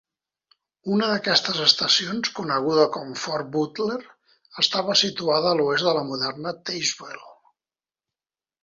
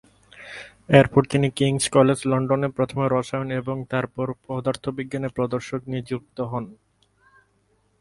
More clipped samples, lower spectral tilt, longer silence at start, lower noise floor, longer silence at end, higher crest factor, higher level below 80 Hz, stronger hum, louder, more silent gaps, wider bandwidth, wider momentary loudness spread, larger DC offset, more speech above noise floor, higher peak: neither; second, -3 dB/octave vs -6 dB/octave; first, 0.85 s vs 0.35 s; first, under -90 dBFS vs -65 dBFS; about the same, 1.3 s vs 1.25 s; about the same, 22 dB vs 24 dB; second, -68 dBFS vs -54 dBFS; neither; about the same, -22 LUFS vs -23 LUFS; neither; second, 7.8 kHz vs 11.5 kHz; about the same, 12 LU vs 14 LU; neither; first, over 67 dB vs 43 dB; about the same, -2 dBFS vs 0 dBFS